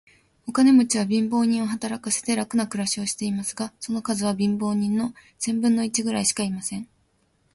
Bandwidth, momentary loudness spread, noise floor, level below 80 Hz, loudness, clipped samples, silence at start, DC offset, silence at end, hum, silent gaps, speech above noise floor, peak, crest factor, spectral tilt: 12 kHz; 11 LU; -66 dBFS; -62 dBFS; -23 LUFS; under 0.1%; 0.45 s; under 0.1%; 0.7 s; none; none; 43 dB; -8 dBFS; 16 dB; -4 dB/octave